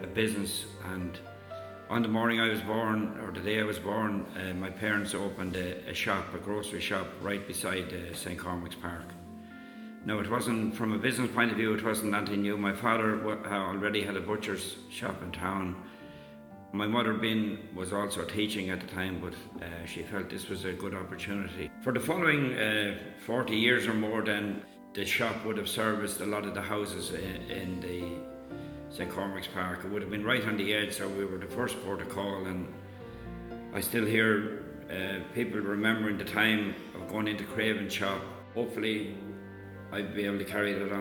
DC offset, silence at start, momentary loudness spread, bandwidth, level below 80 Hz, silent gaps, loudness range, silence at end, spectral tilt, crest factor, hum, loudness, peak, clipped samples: under 0.1%; 0 s; 14 LU; over 20 kHz; -60 dBFS; none; 6 LU; 0 s; -4.5 dB/octave; 22 dB; none; -32 LUFS; -10 dBFS; under 0.1%